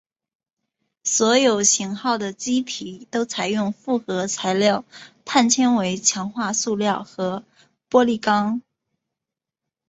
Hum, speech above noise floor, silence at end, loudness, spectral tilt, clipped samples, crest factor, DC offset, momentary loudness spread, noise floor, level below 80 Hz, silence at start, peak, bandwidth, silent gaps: none; 66 dB; 1.3 s; -21 LUFS; -3 dB/octave; under 0.1%; 20 dB; under 0.1%; 11 LU; -87 dBFS; -66 dBFS; 1.05 s; -2 dBFS; 8.2 kHz; none